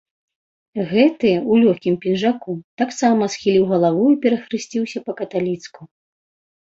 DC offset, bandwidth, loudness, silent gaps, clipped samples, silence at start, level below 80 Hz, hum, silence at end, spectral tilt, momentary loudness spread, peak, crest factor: under 0.1%; 7.8 kHz; -18 LUFS; 2.64-2.77 s; under 0.1%; 0.75 s; -62 dBFS; none; 0.8 s; -6 dB/octave; 12 LU; -2 dBFS; 18 dB